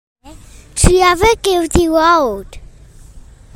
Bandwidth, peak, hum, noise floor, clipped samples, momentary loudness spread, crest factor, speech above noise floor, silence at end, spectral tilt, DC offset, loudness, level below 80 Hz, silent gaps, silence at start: 16.5 kHz; 0 dBFS; none; -39 dBFS; under 0.1%; 10 LU; 14 dB; 26 dB; 0.35 s; -4.5 dB/octave; under 0.1%; -12 LUFS; -24 dBFS; none; 0.25 s